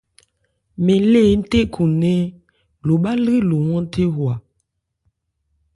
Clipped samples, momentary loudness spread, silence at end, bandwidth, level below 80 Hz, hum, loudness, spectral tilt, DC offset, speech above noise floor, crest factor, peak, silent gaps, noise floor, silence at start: under 0.1%; 10 LU; 1.35 s; 11.5 kHz; -42 dBFS; none; -18 LUFS; -8 dB/octave; under 0.1%; 56 dB; 14 dB; -4 dBFS; none; -72 dBFS; 0.8 s